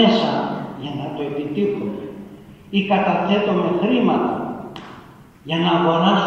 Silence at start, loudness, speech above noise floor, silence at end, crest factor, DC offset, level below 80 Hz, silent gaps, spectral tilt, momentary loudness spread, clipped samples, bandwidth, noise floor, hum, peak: 0 s; -20 LUFS; 26 dB; 0 s; 18 dB; under 0.1%; -56 dBFS; none; -7 dB/octave; 18 LU; under 0.1%; 7.2 kHz; -43 dBFS; none; -2 dBFS